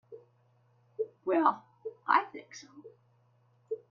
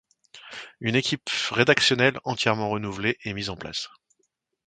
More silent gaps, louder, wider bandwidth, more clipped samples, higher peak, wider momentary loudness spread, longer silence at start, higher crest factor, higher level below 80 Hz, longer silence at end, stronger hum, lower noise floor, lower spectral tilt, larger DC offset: neither; second, -31 LUFS vs -24 LUFS; second, 7.2 kHz vs 9.4 kHz; neither; second, -10 dBFS vs -4 dBFS; first, 24 LU vs 17 LU; second, 0.1 s vs 0.35 s; about the same, 24 dB vs 24 dB; second, -86 dBFS vs -58 dBFS; second, 0.15 s vs 0.8 s; first, 60 Hz at -70 dBFS vs none; second, -68 dBFS vs -74 dBFS; about the same, -4.5 dB/octave vs -4 dB/octave; neither